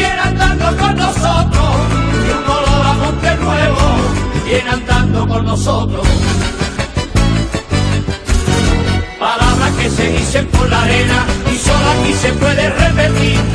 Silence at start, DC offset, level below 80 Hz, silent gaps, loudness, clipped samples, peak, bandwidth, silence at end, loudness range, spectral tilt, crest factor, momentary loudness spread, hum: 0 s; under 0.1%; -18 dBFS; none; -13 LUFS; under 0.1%; 0 dBFS; 11 kHz; 0 s; 3 LU; -5 dB/octave; 12 dB; 5 LU; none